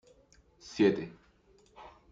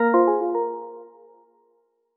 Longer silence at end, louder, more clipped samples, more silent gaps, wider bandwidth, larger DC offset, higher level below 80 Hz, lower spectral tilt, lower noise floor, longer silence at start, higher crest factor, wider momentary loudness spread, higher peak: second, 0.25 s vs 1.1 s; second, -29 LUFS vs -23 LUFS; neither; neither; first, 7.6 kHz vs 3.9 kHz; neither; first, -68 dBFS vs -78 dBFS; about the same, -6 dB/octave vs -6 dB/octave; about the same, -64 dBFS vs -67 dBFS; first, 0.65 s vs 0 s; about the same, 20 dB vs 18 dB; first, 26 LU vs 22 LU; second, -14 dBFS vs -8 dBFS